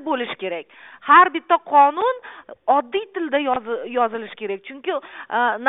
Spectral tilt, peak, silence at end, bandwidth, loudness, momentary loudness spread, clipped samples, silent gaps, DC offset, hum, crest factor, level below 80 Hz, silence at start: -8 dB/octave; -2 dBFS; 0 s; 4 kHz; -20 LUFS; 16 LU; under 0.1%; none; under 0.1%; none; 18 dB; -68 dBFS; 0 s